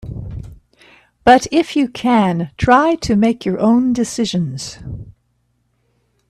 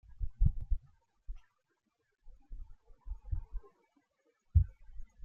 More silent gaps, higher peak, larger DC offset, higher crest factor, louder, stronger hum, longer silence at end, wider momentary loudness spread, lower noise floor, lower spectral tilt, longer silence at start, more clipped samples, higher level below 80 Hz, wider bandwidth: neither; first, 0 dBFS vs -14 dBFS; neither; second, 16 dB vs 22 dB; first, -15 LUFS vs -37 LUFS; neither; first, 1.2 s vs 0.2 s; second, 18 LU vs 25 LU; second, -64 dBFS vs -81 dBFS; second, -5.5 dB/octave vs -11 dB/octave; about the same, 0.05 s vs 0.15 s; neither; about the same, -40 dBFS vs -38 dBFS; first, 12.5 kHz vs 1.8 kHz